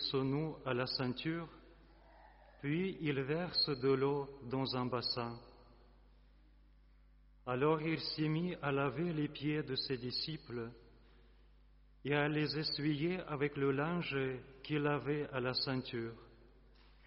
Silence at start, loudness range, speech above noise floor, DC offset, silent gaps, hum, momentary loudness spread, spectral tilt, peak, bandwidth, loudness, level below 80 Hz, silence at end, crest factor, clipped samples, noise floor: 0 s; 4 LU; 27 dB; under 0.1%; none; none; 11 LU; -4 dB/octave; -20 dBFS; 5.8 kHz; -37 LUFS; -64 dBFS; 0 s; 20 dB; under 0.1%; -64 dBFS